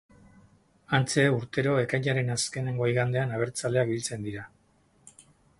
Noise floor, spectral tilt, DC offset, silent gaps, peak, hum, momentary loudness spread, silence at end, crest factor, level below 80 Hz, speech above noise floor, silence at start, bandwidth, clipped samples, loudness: -65 dBFS; -5 dB/octave; under 0.1%; none; -8 dBFS; none; 10 LU; 0.4 s; 20 dB; -62 dBFS; 38 dB; 0.9 s; 11.5 kHz; under 0.1%; -27 LUFS